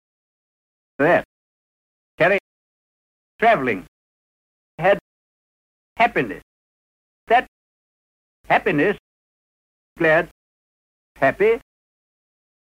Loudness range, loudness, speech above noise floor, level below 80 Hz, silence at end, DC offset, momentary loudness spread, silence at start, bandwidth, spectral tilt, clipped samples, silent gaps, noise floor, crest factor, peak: 3 LU; -20 LUFS; over 72 dB; -56 dBFS; 1.05 s; under 0.1%; 8 LU; 1 s; 15 kHz; -6.5 dB/octave; under 0.1%; 1.25-2.18 s, 2.40-3.39 s, 3.88-4.78 s, 5.01-5.96 s, 6.42-7.27 s, 7.48-8.44 s, 8.99-9.96 s, 10.31-11.15 s; under -90 dBFS; 18 dB; -6 dBFS